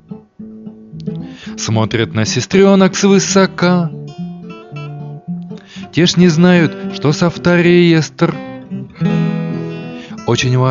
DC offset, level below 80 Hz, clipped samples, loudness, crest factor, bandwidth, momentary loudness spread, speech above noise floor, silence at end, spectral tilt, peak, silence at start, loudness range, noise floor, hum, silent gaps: under 0.1%; -48 dBFS; under 0.1%; -13 LUFS; 14 dB; 7.6 kHz; 19 LU; 22 dB; 0 s; -5.5 dB/octave; 0 dBFS; 0.1 s; 3 LU; -33 dBFS; none; none